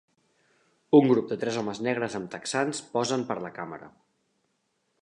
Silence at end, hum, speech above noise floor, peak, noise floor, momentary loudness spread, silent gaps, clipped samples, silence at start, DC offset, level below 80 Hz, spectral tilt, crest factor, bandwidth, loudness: 1.15 s; none; 49 dB; -6 dBFS; -75 dBFS; 16 LU; none; under 0.1%; 0.9 s; under 0.1%; -72 dBFS; -5 dB/octave; 22 dB; 11 kHz; -27 LUFS